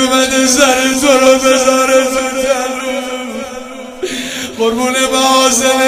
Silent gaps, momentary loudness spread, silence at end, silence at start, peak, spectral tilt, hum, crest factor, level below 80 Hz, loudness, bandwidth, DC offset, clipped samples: none; 14 LU; 0 s; 0 s; 0 dBFS; -1 dB/octave; none; 12 dB; -44 dBFS; -11 LUFS; 16.5 kHz; under 0.1%; 0.1%